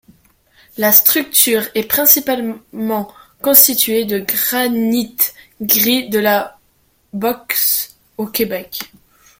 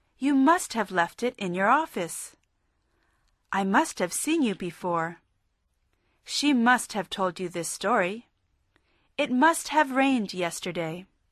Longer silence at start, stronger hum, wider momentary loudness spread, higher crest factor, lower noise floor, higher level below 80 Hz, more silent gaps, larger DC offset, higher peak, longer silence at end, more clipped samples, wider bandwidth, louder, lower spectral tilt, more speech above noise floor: first, 0.75 s vs 0.2 s; neither; first, 17 LU vs 11 LU; about the same, 16 dB vs 18 dB; second, -58 dBFS vs -73 dBFS; first, -56 dBFS vs -68 dBFS; neither; neither; first, 0 dBFS vs -10 dBFS; first, 0.55 s vs 0.3 s; first, 0.2% vs under 0.1%; first, over 20 kHz vs 13.5 kHz; first, -13 LUFS vs -26 LUFS; second, -2 dB/octave vs -3.5 dB/octave; second, 43 dB vs 47 dB